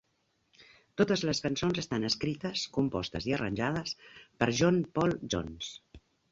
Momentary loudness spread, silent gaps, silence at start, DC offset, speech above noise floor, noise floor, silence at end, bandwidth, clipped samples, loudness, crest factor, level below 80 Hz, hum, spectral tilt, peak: 13 LU; none; 0.6 s; under 0.1%; 44 dB; -75 dBFS; 0.35 s; 7.8 kHz; under 0.1%; -31 LUFS; 22 dB; -56 dBFS; none; -5 dB/octave; -10 dBFS